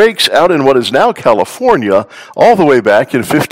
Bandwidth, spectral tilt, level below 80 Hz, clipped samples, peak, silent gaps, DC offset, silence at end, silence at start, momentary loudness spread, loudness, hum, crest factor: 18.5 kHz; -4.5 dB/octave; -48 dBFS; 3%; 0 dBFS; none; 0.4%; 0.05 s; 0 s; 5 LU; -10 LUFS; none; 10 dB